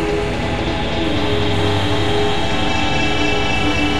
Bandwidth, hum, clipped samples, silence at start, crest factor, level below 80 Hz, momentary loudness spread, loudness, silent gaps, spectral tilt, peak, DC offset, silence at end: 12.5 kHz; none; under 0.1%; 0 s; 12 dB; -30 dBFS; 3 LU; -18 LUFS; none; -5 dB/octave; -4 dBFS; 8%; 0 s